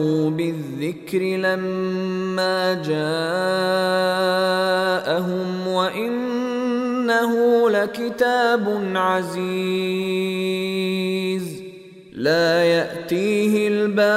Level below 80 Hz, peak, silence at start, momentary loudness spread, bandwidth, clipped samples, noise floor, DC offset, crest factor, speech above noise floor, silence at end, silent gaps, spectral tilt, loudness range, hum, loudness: -66 dBFS; -6 dBFS; 0 s; 7 LU; 16 kHz; under 0.1%; -40 dBFS; under 0.1%; 16 dB; 20 dB; 0 s; none; -5.5 dB/octave; 3 LU; none; -21 LUFS